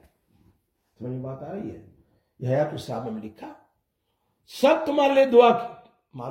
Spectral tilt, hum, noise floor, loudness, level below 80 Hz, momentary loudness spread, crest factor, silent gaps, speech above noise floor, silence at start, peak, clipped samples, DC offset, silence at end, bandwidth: -6.5 dB/octave; none; -75 dBFS; -22 LUFS; -66 dBFS; 23 LU; 22 dB; none; 52 dB; 1 s; -4 dBFS; under 0.1%; under 0.1%; 0 s; 16.5 kHz